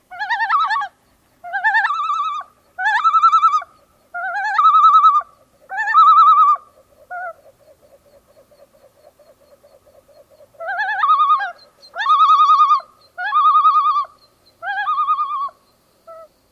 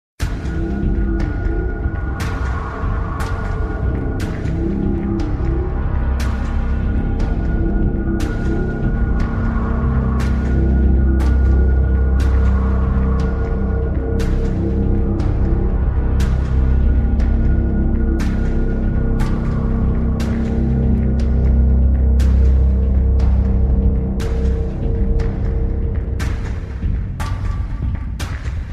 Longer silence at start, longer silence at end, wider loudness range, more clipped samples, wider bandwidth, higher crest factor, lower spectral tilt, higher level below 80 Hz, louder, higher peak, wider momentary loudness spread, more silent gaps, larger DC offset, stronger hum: about the same, 0.1 s vs 0.2 s; first, 0.3 s vs 0 s; about the same, 8 LU vs 6 LU; neither; about the same, 8 kHz vs 7.4 kHz; about the same, 14 dB vs 12 dB; second, 0.5 dB/octave vs -8.5 dB/octave; second, -68 dBFS vs -18 dBFS; first, -14 LUFS vs -19 LUFS; about the same, -4 dBFS vs -4 dBFS; first, 20 LU vs 7 LU; neither; neither; neither